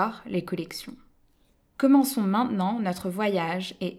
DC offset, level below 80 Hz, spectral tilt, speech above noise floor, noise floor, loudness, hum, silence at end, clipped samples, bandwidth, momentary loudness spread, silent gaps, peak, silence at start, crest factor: under 0.1%; -64 dBFS; -5.5 dB/octave; 39 dB; -64 dBFS; -26 LUFS; none; 0 s; under 0.1%; 15.5 kHz; 13 LU; none; -8 dBFS; 0 s; 18 dB